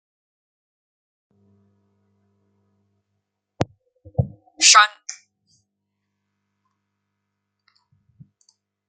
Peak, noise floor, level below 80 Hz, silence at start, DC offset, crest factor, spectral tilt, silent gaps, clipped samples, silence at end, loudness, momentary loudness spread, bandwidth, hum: 0 dBFS; -79 dBFS; -58 dBFS; 3.6 s; under 0.1%; 26 dB; -1 dB/octave; none; under 0.1%; 3.75 s; -17 LUFS; 22 LU; 9 kHz; 50 Hz at -55 dBFS